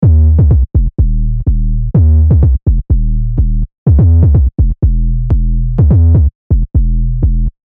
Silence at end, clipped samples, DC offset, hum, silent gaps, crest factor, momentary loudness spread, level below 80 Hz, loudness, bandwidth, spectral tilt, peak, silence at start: 0.2 s; under 0.1%; under 0.1%; none; 3.78-3.86 s, 6.35-6.50 s; 8 dB; 7 LU; -12 dBFS; -12 LUFS; 1.6 kHz; -14.5 dB/octave; 0 dBFS; 0 s